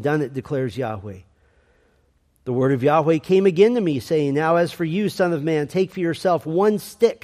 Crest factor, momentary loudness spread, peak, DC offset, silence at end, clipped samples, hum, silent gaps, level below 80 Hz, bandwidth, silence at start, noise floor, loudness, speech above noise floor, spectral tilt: 16 dB; 9 LU; -4 dBFS; under 0.1%; 0.1 s; under 0.1%; none; none; -60 dBFS; 15 kHz; 0 s; -62 dBFS; -20 LUFS; 42 dB; -7 dB/octave